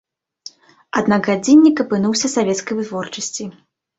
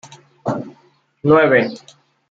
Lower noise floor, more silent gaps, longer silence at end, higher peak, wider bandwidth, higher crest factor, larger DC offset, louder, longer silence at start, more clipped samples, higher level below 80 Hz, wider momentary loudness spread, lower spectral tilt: second, -42 dBFS vs -56 dBFS; neither; about the same, 0.45 s vs 0.55 s; about the same, -2 dBFS vs -2 dBFS; about the same, 8 kHz vs 7.8 kHz; about the same, 16 dB vs 18 dB; neither; about the same, -17 LUFS vs -17 LUFS; first, 0.95 s vs 0.45 s; neither; about the same, -60 dBFS vs -58 dBFS; first, 26 LU vs 21 LU; second, -4.5 dB/octave vs -7 dB/octave